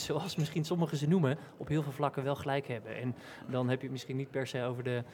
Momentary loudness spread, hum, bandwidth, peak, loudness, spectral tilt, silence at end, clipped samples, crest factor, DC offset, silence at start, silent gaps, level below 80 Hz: 9 LU; none; 17.5 kHz; -16 dBFS; -35 LUFS; -6.5 dB/octave; 0 s; under 0.1%; 18 dB; under 0.1%; 0 s; none; -70 dBFS